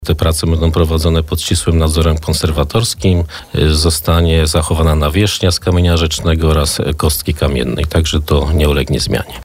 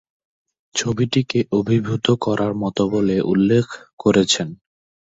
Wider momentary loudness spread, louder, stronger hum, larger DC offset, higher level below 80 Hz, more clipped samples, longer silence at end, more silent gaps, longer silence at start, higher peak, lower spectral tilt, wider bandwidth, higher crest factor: second, 3 LU vs 6 LU; first, -13 LUFS vs -19 LUFS; neither; neither; first, -20 dBFS vs -52 dBFS; neither; second, 0 s vs 0.6 s; second, none vs 3.93-3.97 s; second, 0 s vs 0.75 s; about the same, -2 dBFS vs -4 dBFS; about the same, -5 dB/octave vs -5.5 dB/octave; first, 16 kHz vs 8 kHz; second, 10 dB vs 16 dB